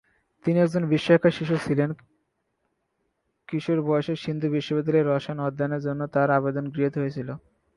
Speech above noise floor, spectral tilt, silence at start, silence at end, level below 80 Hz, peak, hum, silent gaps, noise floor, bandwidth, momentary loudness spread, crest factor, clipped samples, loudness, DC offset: 51 dB; -8 dB/octave; 0.45 s; 0.4 s; -62 dBFS; -6 dBFS; none; none; -75 dBFS; 11.5 kHz; 11 LU; 20 dB; under 0.1%; -25 LUFS; under 0.1%